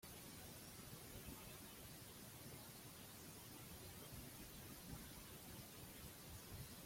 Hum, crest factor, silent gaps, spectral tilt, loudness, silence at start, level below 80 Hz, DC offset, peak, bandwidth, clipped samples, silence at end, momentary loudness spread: none; 16 dB; none; -3.5 dB/octave; -56 LUFS; 0 s; -68 dBFS; under 0.1%; -42 dBFS; 16.5 kHz; under 0.1%; 0 s; 2 LU